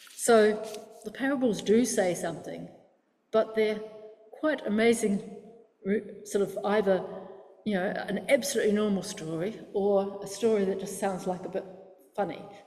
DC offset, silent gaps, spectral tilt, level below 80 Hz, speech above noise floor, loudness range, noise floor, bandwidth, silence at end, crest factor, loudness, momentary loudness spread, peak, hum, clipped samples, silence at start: under 0.1%; none; -4.5 dB/octave; -68 dBFS; 39 dB; 2 LU; -66 dBFS; 15 kHz; 0.05 s; 18 dB; -28 LUFS; 17 LU; -10 dBFS; none; under 0.1%; 0 s